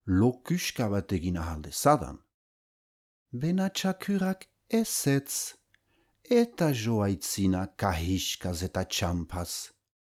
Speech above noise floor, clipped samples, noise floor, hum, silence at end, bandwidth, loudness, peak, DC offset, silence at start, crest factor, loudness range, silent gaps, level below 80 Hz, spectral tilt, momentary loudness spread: 42 dB; under 0.1%; -71 dBFS; none; 0.4 s; 19 kHz; -29 LUFS; -10 dBFS; under 0.1%; 0.05 s; 20 dB; 2 LU; 2.34-3.26 s; -50 dBFS; -5 dB/octave; 9 LU